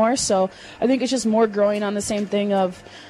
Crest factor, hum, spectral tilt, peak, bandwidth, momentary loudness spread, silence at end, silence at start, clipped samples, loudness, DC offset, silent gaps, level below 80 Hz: 12 dB; none; -4.5 dB/octave; -8 dBFS; 13.5 kHz; 6 LU; 0 s; 0 s; under 0.1%; -21 LUFS; under 0.1%; none; -54 dBFS